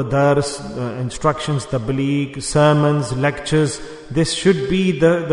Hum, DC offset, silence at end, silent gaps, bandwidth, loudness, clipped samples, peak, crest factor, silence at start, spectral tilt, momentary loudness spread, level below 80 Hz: none; under 0.1%; 0 s; none; 11 kHz; -18 LUFS; under 0.1%; -2 dBFS; 16 dB; 0 s; -5.5 dB/octave; 10 LU; -40 dBFS